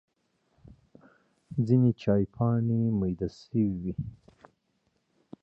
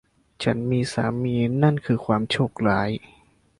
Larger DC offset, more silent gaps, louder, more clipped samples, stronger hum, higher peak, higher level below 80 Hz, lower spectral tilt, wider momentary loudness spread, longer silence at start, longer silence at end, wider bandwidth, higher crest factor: neither; neither; second, -28 LUFS vs -23 LUFS; neither; neither; second, -12 dBFS vs -6 dBFS; about the same, -54 dBFS vs -52 dBFS; first, -10.5 dB/octave vs -7 dB/octave; first, 12 LU vs 6 LU; first, 1.5 s vs 0.4 s; first, 1.3 s vs 0.6 s; second, 6.6 kHz vs 11.5 kHz; about the same, 18 dB vs 18 dB